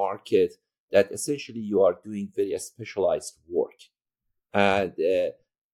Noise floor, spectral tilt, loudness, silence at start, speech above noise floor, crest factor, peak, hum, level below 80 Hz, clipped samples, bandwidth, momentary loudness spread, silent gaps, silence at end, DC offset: -80 dBFS; -4.5 dB/octave; -26 LUFS; 0 s; 55 dB; 20 dB; -6 dBFS; none; -64 dBFS; under 0.1%; 14.5 kHz; 10 LU; 0.79-0.88 s; 0.45 s; under 0.1%